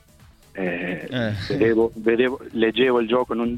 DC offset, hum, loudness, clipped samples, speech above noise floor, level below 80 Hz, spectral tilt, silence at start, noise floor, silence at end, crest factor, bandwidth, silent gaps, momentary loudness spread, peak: under 0.1%; none; -22 LUFS; under 0.1%; 30 dB; -52 dBFS; -7 dB/octave; 0.55 s; -51 dBFS; 0 s; 18 dB; 12 kHz; none; 9 LU; -4 dBFS